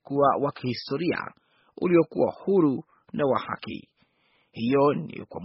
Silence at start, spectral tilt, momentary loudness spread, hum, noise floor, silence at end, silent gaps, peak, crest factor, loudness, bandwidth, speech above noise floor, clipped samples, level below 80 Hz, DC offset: 0.1 s; -6 dB/octave; 15 LU; none; -67 dBFS; 0 s; none; -8 dBFS; 18 dB; -25 LUFS; 5.8 kHz; 43 dB; under 0.1%; -66 dBFS; under 0.1%